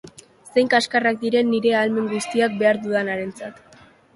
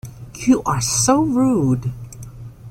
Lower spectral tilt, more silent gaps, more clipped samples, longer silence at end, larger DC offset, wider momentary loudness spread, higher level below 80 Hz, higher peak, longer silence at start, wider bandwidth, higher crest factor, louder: about the same, -4.5 dB/octave vs -5 dB/octave; neither; neither; first, 0.65 s vs 0 s; neither; second, 10 LU vs 21 LU; second, -64 dBFS vs -42 dBFS; about the same, -4 dBFS vs -4 dBFS; about the same, 0.05 s vs 0.05 s; second, 11.5 kHz vs 16.5 kHz; about the same, 18 dB vs 16 dB; second, -20 LUFS vs -17 LUFS